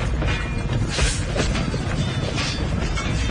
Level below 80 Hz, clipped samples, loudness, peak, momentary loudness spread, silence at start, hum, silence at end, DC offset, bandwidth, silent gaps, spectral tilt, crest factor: -28 dBFS; under 0.1%; -23 LUFS; -10 dBFS; 3 LU; 0 s; none; 0 s; under 0.1%; 10.5 kHz; none; -4.5 dB/octave; 12 dB